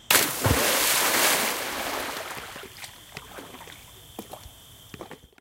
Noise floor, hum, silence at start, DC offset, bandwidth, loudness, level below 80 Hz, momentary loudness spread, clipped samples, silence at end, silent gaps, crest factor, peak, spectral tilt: -48 dBFS; none; 0.1 s; under 0.1%; 17 kHz; -23 LUFS; -48 dBFS; 23 LU; under 0.1%; 0.25 s; none; 26 dB; -2 dBFS; -1.5 dB/octave